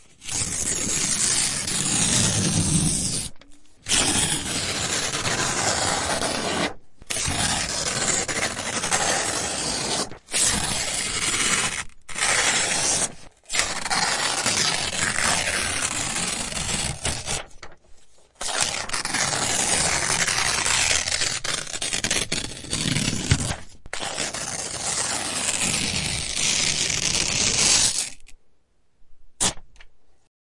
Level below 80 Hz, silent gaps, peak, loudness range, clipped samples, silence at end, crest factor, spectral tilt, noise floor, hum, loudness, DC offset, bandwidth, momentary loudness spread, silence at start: -44 dBFS; none; -2 dBFS; 4 LU; under 0.1%; 0.35 s; 22 dB; -1.5 dB/octave; -57 dBFS; none; -22 LUFS; under 0.1%; 11.5 kHz; 8 LU; 0.2 s